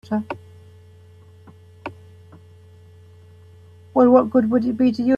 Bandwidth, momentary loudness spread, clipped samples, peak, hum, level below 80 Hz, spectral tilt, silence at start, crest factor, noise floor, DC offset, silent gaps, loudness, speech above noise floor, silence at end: 5.4 kHz; 23 LU; under 0.1%; -2 dBFS; none; -62 dBFS; -8.5 dB/octave; 0.1 s; 20 dB; -47 dBFS; under 0.1%; none; -18 LUFS; 30 dB; 0 s